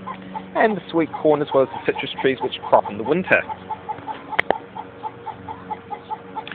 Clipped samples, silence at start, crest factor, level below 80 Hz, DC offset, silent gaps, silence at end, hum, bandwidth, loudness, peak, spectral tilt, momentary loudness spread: under 0.1%; 0 s; 22 dB; -60 dBFS; under 0.1%; none; 0 s; none; 4.6 kHz; -22 LUFS; 0 dBFS; -8 dB/octave; 15 LU